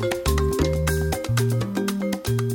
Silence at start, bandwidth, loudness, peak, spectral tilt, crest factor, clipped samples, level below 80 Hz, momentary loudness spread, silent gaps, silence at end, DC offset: 0 s; 18 kHz; -23 LUFS; -8 dBFS; -5.5 dB/octave; 14 dB; under 0.1%; -30 dBFS; 3 LU; none; 0 s; under 0.1%